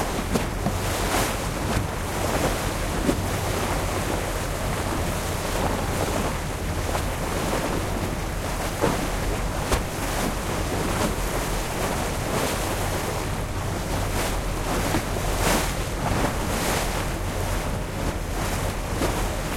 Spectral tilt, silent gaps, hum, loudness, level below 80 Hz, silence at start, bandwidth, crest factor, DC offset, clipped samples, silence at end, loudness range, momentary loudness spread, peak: -4.5 dB/octave; none; none; -26 LUFS; -32 dBFS; 0 s; 16.5 kHz; 20 dB; under 0.1%; under 0.1%; 0 s; 1 LU; 4 LU; -6 dBFS